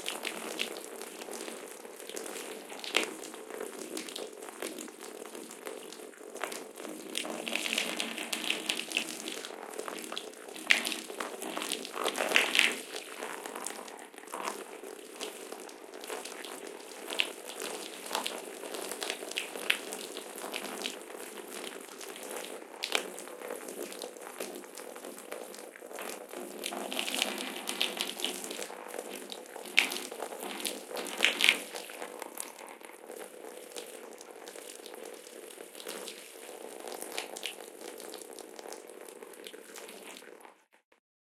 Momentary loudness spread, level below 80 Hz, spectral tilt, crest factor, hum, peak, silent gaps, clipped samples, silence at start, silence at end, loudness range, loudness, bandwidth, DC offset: 16 LU; -86 dBFS; 0 dB/octave; 38 dB; none; -2 dBFS; none; under 0.1%; 0 s; 0.85 s; 13 LU; -35 LUFS; 17 kHz; under 0.1%